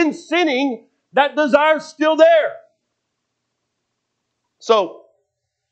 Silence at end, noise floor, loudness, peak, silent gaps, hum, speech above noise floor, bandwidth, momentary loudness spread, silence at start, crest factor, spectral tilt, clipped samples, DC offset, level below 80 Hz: 0.8 s; -75 dBFS; -16 LUFS; 0 dBFS; none; none; 60 dB; 8.4 kHz; 13 LU; 0 s; 18 dB; -3.5 dB/octave; under 0.1%; under 0.1%; -76 dBFS